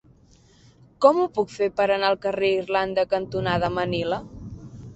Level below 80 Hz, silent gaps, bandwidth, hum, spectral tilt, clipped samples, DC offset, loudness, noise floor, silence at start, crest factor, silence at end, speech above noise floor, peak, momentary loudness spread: -50 dBFS; none; 8.2 kHz; none; -6 dB/octave; under 0.1%; under 0.1%; -23 LUFS; -55 dBFS; 1 s; 22 dB; 0 s; 33 dB; -2 dBFS; 14 LU